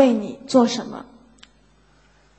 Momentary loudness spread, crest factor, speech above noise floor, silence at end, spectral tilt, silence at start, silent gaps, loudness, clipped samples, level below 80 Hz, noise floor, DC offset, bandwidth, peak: 17 LU; 20 dB; 37 dB; 1.35 s; -5 dB/octave; 0 s; none; -20 LUFS; under 0.1%; -60 dBFS; -56 dBFS; under 0.1%; 8.6 kHz; -2 dBFS